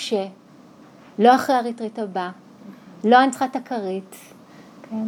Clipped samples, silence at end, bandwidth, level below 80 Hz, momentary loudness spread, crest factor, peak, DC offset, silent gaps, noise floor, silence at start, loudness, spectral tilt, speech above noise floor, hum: under 0.1%; 0 s; 17 kHz; -76 dBFS; 17 LU; 20 dB; -2 dBFS; under 0.1%; none; -47 dBFS; 0 s; -20 LUFS; -4.5 dB/octave; 27 dB; none